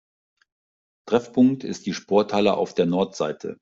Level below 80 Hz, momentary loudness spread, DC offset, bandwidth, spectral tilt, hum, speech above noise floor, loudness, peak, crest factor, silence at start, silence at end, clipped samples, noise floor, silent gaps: -64 dBFS; 9 LU; under 0.1%; 7.6 kHz; -6 dB/octave; none; over 68 dB; -22 LUFS; -6 dBFS; 18 dB; 1.05 s; 0.1 s; under 0.1%; under -90 dBFS; none